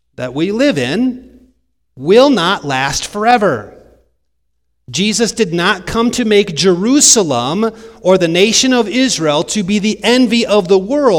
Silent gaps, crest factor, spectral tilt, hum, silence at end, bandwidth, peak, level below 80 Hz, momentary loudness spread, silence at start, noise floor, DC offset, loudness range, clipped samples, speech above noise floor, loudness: none; 14 dB; -3.5 dB/octave; none; 0 s; over 20 kHz; 0 dBFS; -44 dBFS; 9 LU; 0.2 s; -69 dBFS; under 0.1%; 5 LU; 0.1%; 57 dB; -12 LUFS